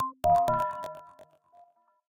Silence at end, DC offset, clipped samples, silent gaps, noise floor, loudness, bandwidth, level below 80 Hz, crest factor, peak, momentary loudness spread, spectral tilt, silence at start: 0.85 s; under 0.1%; under 0.1%; none; -61 dBFS; -27 LUFS; 17 kHz; -58 dBFS; 16 dB; -14 dBFS; 18 LU; -6 dB/octave; 0 s